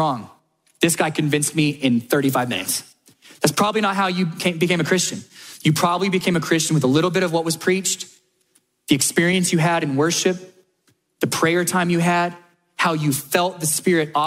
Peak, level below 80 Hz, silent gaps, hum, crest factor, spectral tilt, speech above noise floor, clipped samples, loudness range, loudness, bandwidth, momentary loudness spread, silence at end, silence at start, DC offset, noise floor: -2 dBFS; -62 dBFS; none; none; 18 dB; -4 dB/octave; 45 dB; under 0.1%; 2 LU; -20 LUFS; 16 kHz; 6 LU; 0 s; 0 s; under 0.1%; -64 dBFS